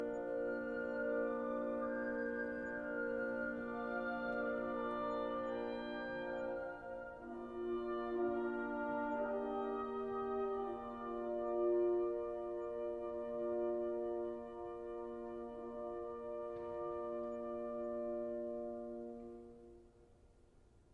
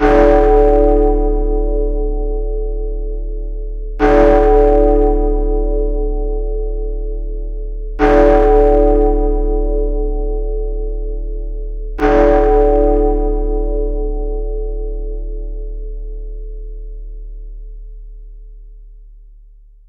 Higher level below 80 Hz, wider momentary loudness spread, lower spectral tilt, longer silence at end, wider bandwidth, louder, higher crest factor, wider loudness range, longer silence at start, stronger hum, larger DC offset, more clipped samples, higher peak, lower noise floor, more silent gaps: second, -68 dBFS vs -18 dBFS; second, 9 LU vs 20 LU; second, -7.5 dB/octave vs -9 dB/octave; second, 0.15 s vs 0.7 s; first, 5 kHz vs 4.4 kHz; second, -42 LUFS vs -15 LUFS; about the same, 14 dB vs 14 dB; second, 5 LU vs 16 LU; about the same, 0 s vs 0 s; neither; neither; neither; second, -26 dBFS vs 0 dBFS; first, -66 dBFS vs -41 dBFS; neither